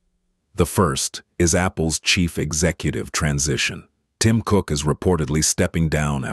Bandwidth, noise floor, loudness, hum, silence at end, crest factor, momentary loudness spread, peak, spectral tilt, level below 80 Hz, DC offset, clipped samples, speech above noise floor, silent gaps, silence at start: 12.5 kHz; -69 dBFS; -20 LUFS; none; 0 s; 18 dB; 6 LU; -4 dBFS; -4 dB/octave; -36 dBFS; under 0.1%; under 0.1%; 48 dB; none; 0.55 s